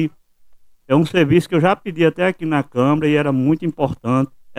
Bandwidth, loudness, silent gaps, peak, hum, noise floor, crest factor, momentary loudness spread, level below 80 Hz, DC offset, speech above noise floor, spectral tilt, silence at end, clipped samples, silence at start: 13.5 kHz; -18 LUFS; none; -2 dBFS; none; -47 dBFS; 16 dB; 5 LU; -50 dBFS; under 0.1%; 30 dB; -7.5 dB/octave; 0 s; under 0.1%; 0 s